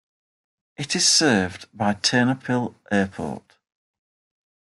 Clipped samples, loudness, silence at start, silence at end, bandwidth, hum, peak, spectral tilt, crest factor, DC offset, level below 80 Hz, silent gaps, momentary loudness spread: under 0.1%; -21 LUFS; 0.8 s; 1.25 s; 12 kHz; none; -6 dBFS; -3 dB/octave; 20 dB; under 0.1%; -64 dBFS; none; 16 LU